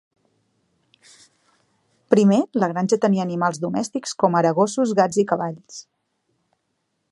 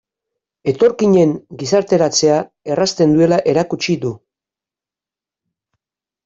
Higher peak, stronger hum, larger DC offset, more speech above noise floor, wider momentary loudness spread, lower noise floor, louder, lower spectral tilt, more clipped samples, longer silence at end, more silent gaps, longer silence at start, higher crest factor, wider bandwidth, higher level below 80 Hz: about the same, 0 dBFS vs -2 dBFS; neither; neither; second, 54 dB vs 75 dB; about the same, 10 LU vs 10 LU; second, -74 dBFS vs -89 dBFS; second, -20 LUFS vs -15 LUFS; about the same, -6 dB/octave vs -5 dB/octave; neither; second, 1.3 s vs 2.1 s; neither; first, 2.1 s vs 0.65 s; first, 22 dB vs 16 dB; first, 11.5 kHz vs 7.8 kHz; second, -70 dBFS vs -56 dBFS